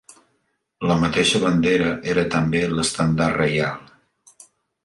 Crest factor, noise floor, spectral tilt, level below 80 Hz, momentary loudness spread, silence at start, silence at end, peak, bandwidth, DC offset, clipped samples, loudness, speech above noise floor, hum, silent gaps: 18 dB; -70 dBFS; -5 dB/octave; -46 dBFS; 6 LU; 0.8 s; 1.05 s; -4 dBFS; 11.5 kHz; under 0.1%; under 0.1%; -20 LUFS; 51 dB; none; none